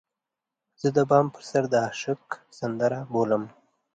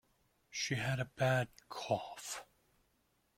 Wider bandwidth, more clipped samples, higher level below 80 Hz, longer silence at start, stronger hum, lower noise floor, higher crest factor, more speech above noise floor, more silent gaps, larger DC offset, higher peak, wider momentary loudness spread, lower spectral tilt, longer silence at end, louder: second, 9.2 kHz vs 16 kHz; neither; about the same, -70 dBFS vs -70 dBFS; first, 0.85 s vs 0.5 s; neither; first, -87 dBFS vs -77 dBFS; about the same, 20 dB vs 20 dB; first, 62 dB vs 40 dB; neither; neither; first, -6 dBFS vs -20 dBFS; about the same, 12 LU vs 13 LU; first, -6.5 dB/octave vs -4.5 dB/octave; second, 0.5 s vs 0.95 s; first, -26 LUFS vs -38 LUFS